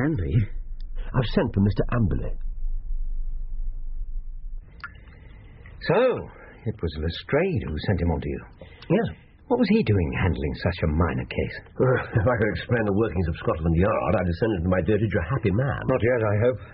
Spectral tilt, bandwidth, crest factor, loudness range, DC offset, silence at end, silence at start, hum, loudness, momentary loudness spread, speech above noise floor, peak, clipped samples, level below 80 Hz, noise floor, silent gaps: -7 dB/octave; 5.4 kHz; 16 dB; 7 LU; under 0.1%; 0 s; 0 s; none; -24 LUFS; 17 LU; 21 dB; -8 dBFS; under 0.1%; -34 dBFS; -45 dBFS; none